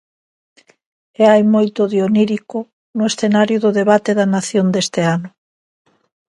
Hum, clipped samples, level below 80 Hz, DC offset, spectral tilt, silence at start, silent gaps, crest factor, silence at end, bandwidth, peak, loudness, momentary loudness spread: none; under 0.1%; -62 dBFS; under 0.1%; -5.5 dB/octave; 1.2 s; 2.73-2.94 s; 16 dB; 1.05 s; 11.5 kHz; 0 dBFS; -15 LUFS; 11 LU